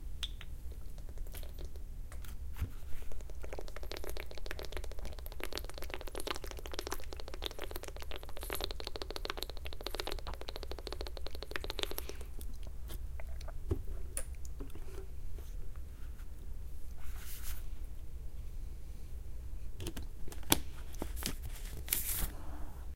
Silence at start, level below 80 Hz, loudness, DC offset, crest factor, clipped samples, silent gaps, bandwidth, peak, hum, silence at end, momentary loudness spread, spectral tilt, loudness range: 0 s; -44 dBFS; -43 LUFS; under 0.1%; 36 dB; under 0.1%; none; 17 kHz; -2 dBFS; none; 0 s; 11 LU; -3 dB/octave; 8 LU